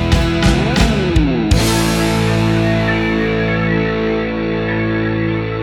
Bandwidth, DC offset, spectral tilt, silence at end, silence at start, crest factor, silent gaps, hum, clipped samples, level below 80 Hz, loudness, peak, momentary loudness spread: 17 kHz; under 0.1%; -5.5 dB/octave; 0 s; 0 s; 14 dB; none; none; under 0.1%; -24 dBFS; -15 LUFS; 0 dBFS; 4 LU